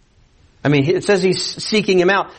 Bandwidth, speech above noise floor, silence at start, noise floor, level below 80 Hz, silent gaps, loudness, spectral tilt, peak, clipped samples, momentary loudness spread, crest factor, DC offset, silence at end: 8.8 kHz; 36 dB; 0.65 s; -52 dBFS; -52 dBFS; none; -16 LUFS; -5 dB/octave; -4 dBFS; under 0.1%; 5 LU; 14 dB; under 0.1%; 0.05 s